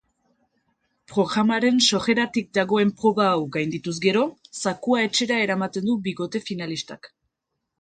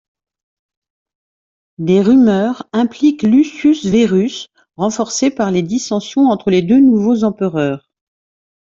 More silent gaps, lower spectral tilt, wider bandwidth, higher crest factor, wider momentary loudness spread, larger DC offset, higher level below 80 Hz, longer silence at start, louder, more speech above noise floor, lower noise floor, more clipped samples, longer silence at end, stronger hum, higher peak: neither; second, -4 dB/octave vs -6 dB/octave; first, 9.4 kHz vs 7.6 kHz; first, 18 dB vs 12 dB; about the same, 10 LU vs 10 LU; neither; second, -64 dBFS vs -52 dBFS; second, 1.1 s vs 1.8 s; second, -22 LUFS vs -14 LUFS; second, 58 dB vs over 77 dB; second, -80 dBFS vs under -90 dBFS; neither; about the same, 0.75 s vs 0.8 s; neither; about the same, -4 dBFS vs -2 dBFS